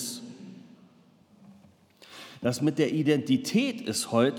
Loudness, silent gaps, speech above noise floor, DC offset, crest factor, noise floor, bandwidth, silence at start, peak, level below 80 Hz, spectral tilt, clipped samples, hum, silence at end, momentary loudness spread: -27 LUFS; none; 33 dB; under 0.1%; 18 dB; -59 dBFS; 18 kHz; 0 s; -10 dBFS; -76 dBFS; -5 dB/octave; under 0.1%; none; 0 s; 21 LU